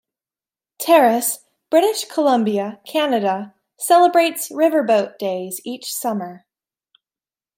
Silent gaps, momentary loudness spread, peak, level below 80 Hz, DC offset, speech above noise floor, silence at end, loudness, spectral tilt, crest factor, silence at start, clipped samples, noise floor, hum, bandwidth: none; 14 LU; -2 dBFS; -76 dBFS; under 0.1%; over 73 dB; 1.2 s; -18 LUFS; -3.5 dB/octave; 16 dB; 0.8 s; under 0.1%; under -90 dBFS; none; 16.5 kHz